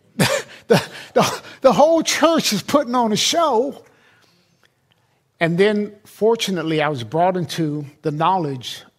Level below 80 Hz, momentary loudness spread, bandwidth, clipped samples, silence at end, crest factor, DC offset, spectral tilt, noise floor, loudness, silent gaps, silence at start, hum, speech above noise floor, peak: -60 dBFS; 9 LU; 16 kHz; under 0.1%; 0.15 s; 18 dB; under 0.1%; -4 dB/octave; -62 dBFS; -18 LUFS; none; 0.2 s; none; 44 dB; -2 dBFS